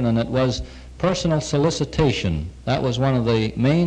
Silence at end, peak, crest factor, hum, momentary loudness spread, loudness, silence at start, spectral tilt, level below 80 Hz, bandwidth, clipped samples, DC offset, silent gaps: 0 s; -6 dBFS; 16 dB; none; 6 LU; -21 LUFS; 0 s; -6 dB/octave; -36 dBFS; 10 kHz; under 0.1%; under 0.1%; none